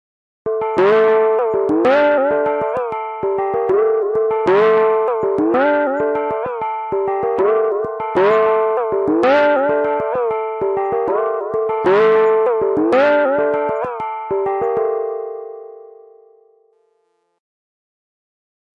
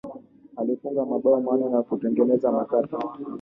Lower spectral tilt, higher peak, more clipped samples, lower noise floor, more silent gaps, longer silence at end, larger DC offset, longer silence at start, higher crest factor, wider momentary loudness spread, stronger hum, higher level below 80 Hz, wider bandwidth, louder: second, -7 dB/octave vs -10.5 dB/octave; first, -4 dBFS vs -8 dBFS; neither; first, -65 dBFS vs -43 dBFS; neither; first, 2.75 s vs 0 s; neither; first, 0.45 s vs 0.05 s; about the same, 14 dB vs 16 dB; about the same, 9 LU vs 10 LU; neither; first, -58 dBFS vs -68 dBFS; first, 6 kHz vs 4 kHz; first, -16 LUFS vs -24 LUFS